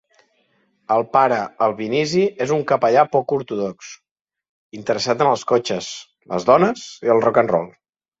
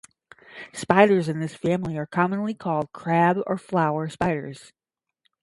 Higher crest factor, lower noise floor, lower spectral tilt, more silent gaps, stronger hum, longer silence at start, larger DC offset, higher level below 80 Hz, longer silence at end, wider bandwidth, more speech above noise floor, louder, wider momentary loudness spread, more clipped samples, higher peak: about the same, 18 dB vs 22 dB; second, -64 dBFS vs -73 dBFS; second, -5 dB/octave vs -7 dB/octave; first, 4.11-4.25 s, 4.49-4.70 s vs none; neither; first, 0.9 s vs 0.5 s; neither; about the same, -62 dBFS vs -58 dBFS; second, 0.5 s vs 0.8 s; second, 8 kHz vs 11.5 kHz; second, 45 dB vs 50 dB; first, -19 LUFS vs -23 LUFS; second, 12 LU vs 16 LU; neither; about the same, -2 dBFS vs -2 dBFS